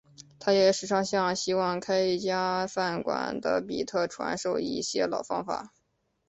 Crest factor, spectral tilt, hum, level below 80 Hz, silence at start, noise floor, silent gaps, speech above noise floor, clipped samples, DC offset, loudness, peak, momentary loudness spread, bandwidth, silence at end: 18 dB; -4 dB/octave; none; -66 dBFS; 0.2 s; -75 dBFS; none; 47 dB; under 0.1%; under 0.1%; -28 LUFS; -10 dBFS; 8 LU; 8.4 kHz; 0.6 s